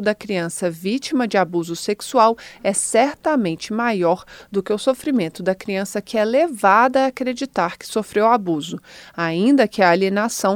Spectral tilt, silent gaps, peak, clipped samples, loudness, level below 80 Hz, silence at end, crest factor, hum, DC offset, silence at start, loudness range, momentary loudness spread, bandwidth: -4.5 dB/octave; none; -2 dBFS; under 0.1%; -19 LUFS; -60 dBFS; 0 s; 18 dB; none; under 0.1%; 0 s; 2 LU; 9 LU; 18.5 kHz